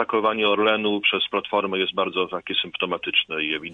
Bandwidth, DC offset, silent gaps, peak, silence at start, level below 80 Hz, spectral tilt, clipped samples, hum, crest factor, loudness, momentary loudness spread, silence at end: 4.8 kHz; under 0.1%; none; -6 dBFS; 0 s; -64 dBFS; -6 dB/octave; under 0.1%; none; 18 dB; -22 LUFS; 5 LU; 0 s